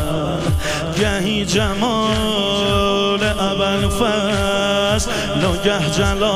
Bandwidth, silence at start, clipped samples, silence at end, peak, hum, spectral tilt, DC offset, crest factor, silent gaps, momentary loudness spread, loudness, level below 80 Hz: 15.5 kHz; 0 s; under 0.1%; 0 s; -4 dBFS; none; -4.5 dB/octave; under 0.1%; 14 dB; none; 3 LU; -17 LUFS; -30 dBFS